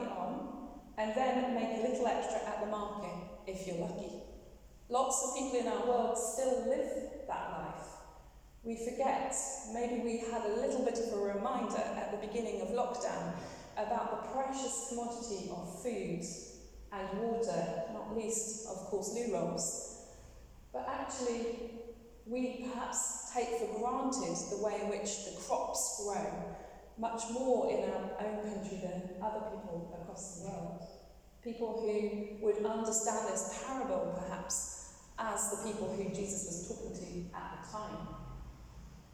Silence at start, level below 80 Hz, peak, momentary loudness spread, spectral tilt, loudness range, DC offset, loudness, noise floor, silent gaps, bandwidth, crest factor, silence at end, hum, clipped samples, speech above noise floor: 0 s; -60 dBFS; -20 dBFS; 13 LU; -4 dB/octave; 4 LU; under 0.1%; -37 LUFS; -57 dBFS; none; 19.5 kHz; 18 dB; 0 s; none; under 0.1%; 20 dB